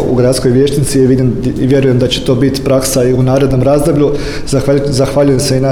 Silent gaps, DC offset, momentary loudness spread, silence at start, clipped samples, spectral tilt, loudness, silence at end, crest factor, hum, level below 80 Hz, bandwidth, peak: none; under 0.1%; 3 LU; 0 s; under 0.1%; -6 dB/octave; -11 LUFS; 0 s; 10 dB; none; -26 dBFS; 16.5 kHz; 0 dBFS